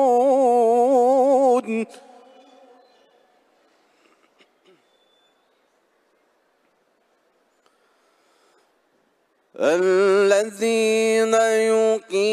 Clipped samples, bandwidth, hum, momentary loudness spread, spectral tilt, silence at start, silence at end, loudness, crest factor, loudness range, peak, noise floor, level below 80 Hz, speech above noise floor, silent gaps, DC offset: under 0.1%; 13.5 kHz; none; 5 LU; -4 dB/octave; 0 s; 0 s; -18 LUFS; 16 dB; 11 LU; -4 dBFS; -66 dBFS; -78 dBFS; 46 dB; none; under 0.1%